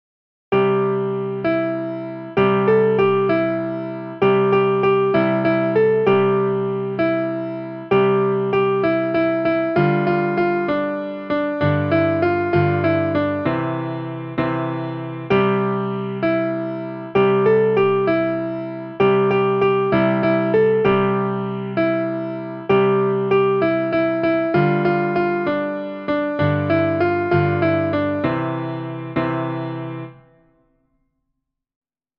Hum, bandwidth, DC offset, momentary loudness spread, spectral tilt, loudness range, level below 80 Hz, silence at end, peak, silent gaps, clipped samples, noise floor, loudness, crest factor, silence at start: none; 5.6 kHz; under 0.1%; 10 LU; -9.5 dB/octave; 4 LU; -54 dBFS; 2.05 s; -4 dBFS; none; under 0.1%; -76 dBFS; -19 LUFS; 14 dB; 0.5 s